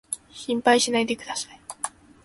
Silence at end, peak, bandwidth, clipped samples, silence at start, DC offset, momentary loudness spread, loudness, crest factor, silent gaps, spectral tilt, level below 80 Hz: 0.35 s; -6 dBFS; 12 kHz; under 0.1%; 0.1 s; under 0.1%; 14 LU; -25 LUFS; 20 dB; none; -2 dB/octave; -64 dBFS